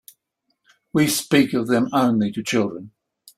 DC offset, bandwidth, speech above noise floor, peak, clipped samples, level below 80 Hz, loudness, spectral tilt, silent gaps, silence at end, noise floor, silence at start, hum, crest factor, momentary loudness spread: under 0.1%; 16 kHz; 54 dB; -4 dBFS; under 0.1%; -60 dBFS; -20 LUFS; -4.5 dB/octave; none; 0.5 s; -74 dBFS; 0.95 s; none; 18 dB; 7 LU